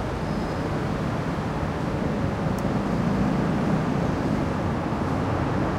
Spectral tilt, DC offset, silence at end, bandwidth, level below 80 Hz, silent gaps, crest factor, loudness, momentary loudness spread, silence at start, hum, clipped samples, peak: -7.5 dB/octave; under 0.1%; 0 s; 15 kHz; -38 dBFS; none; 14 dB; -26 LUFS; 4 LU; 0 s; none; under 0.1%; -12 dBFS